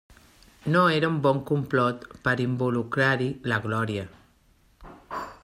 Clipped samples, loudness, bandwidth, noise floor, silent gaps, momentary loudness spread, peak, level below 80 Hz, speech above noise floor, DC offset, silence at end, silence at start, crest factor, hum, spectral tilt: under 0.1%; -25 LUFS; 14 kHz; -61 dBFS; none; 14 LU; -8 dBFS; -58 dBFS; 37 dB; under 0.1%; 0.1 s; 0.65 s; 18 dB; none; -7 dB/octave